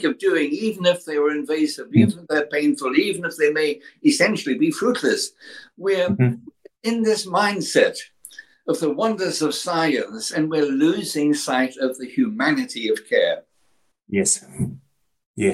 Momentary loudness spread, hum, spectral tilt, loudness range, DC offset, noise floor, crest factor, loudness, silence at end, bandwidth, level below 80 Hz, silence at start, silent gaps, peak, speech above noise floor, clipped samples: 10 LU; none; -4.5 dB/octave; 2 LU; under 0.1%; -67 dBFS; 18 dB; -21 LUFS; 0 s; 15.5 kHz; -62 dBFS; 0 s; 15.26-15.34 s; -4 dBFS; 47 dB; under 0.1%